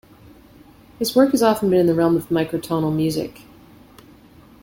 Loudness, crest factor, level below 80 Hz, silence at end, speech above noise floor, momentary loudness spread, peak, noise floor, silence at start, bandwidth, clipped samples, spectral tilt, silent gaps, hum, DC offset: -19 LUFS; 18 dB; -52 dBFS; 1.35 s; 29 dB; 8 LU; -4 dBFS; -47 dBFS; 1 s; 17 kHz; under 0.1%; -6 dB/octave; none; none; under 0.1%